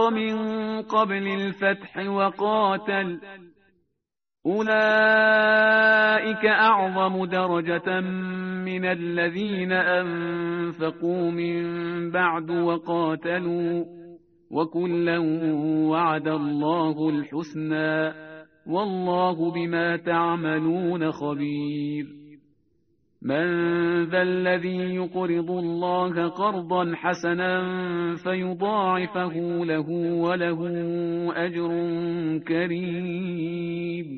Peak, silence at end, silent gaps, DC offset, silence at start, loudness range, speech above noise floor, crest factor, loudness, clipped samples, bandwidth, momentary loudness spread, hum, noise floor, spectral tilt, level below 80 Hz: -6 dBFS; 0 s; none; under 0.1%; 0 s; 7 LU; 58 dB; 18 dB; -24 LUFS; under 0.1%; 6.4 kHz; 10 LU; none; -82 dBFS; -4 dB/octave; -68 dBFS